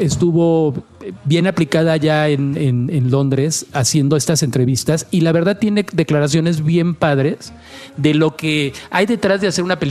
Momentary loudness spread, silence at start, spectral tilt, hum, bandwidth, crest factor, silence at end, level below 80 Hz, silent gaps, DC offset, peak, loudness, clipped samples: 5 LU; 0 s; -5.5 dB/octave; none; 14.5 kHz; 16 dB; 0 s; -50 dBFS; none; under 0.1%; 0 dBFS; -16 LUFS; under 0.1%